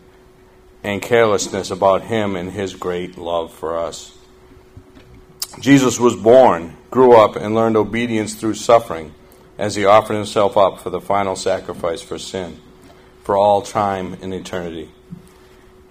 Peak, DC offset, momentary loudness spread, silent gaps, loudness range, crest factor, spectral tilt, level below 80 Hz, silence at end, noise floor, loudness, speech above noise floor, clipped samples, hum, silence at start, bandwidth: 0 dBFS; under 0.1%; 17 LU; none; 8 LU; 18 dB; -5 dB/octave; -50 dBFS; 0.75 s; -47 dBFS; -17 LUFS; 31 dB; under 0.1%; none; 0.85 s; 15.5 kHz